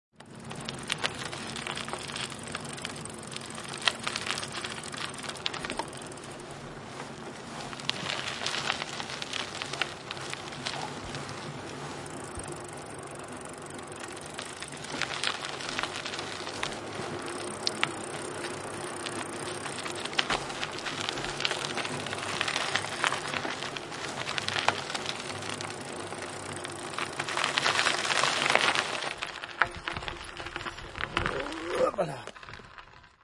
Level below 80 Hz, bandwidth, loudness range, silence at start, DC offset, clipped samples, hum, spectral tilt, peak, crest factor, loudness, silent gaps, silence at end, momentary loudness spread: -58 dBFS; 11.5 kHz; 9 LU; 0.2 s; under 0.1%; under 0.1%; none; -2.5 dB/octave; -2 dBFS; 32 dB; -32 LUFS; none; 0.15 s; 13 LU